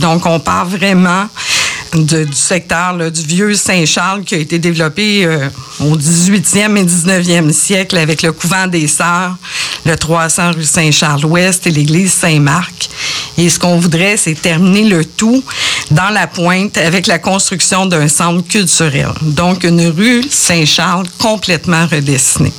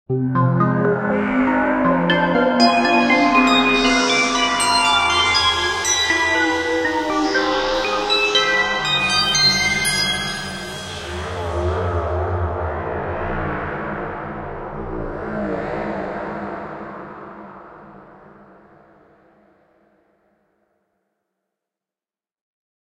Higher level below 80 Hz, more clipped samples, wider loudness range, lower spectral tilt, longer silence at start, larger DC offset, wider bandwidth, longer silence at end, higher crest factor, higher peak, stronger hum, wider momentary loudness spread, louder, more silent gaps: about the same, -40 dBFS vs -40 dBFS; neither; second, 2 LU vs 13 LU; about the same, -3.5 dB/octave vs -3.5 dB/octave; about the same, 0 s vs 0.1 s; neither; first, 19.5 kHz vs 16 kHz; second, 0 s vs 4.75 s; second, 10 dB vs 18 dB; about the same, 0 dBFS vs -2 dBFS; neither; second, 5 LU vs 15 LU; first, -10 LUFS vs -18 LUFS; neither